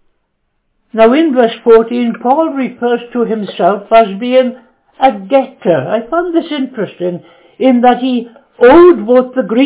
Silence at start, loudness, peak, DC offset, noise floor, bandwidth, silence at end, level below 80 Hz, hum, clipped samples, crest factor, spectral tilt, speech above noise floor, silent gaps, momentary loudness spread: 0.95 s; -11 LUFS; 0 dBFS; under 0.1%; -64 dBFS; 4 kHz; 0 s; -48 dBFS; none; 1%; 10 dB; -10 dB/octave; 54 dB; none; 12 LU